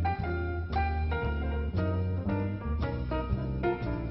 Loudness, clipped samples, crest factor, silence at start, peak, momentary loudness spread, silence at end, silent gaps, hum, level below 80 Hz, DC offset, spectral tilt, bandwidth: -32 LUFS; under 0.1%; 14 dB; 0 s; -18 dBFS; 3 LU; 0 s; none; none; -36 dBFS; under 0.1%; -10.5 dB/octave; 5.8 kHz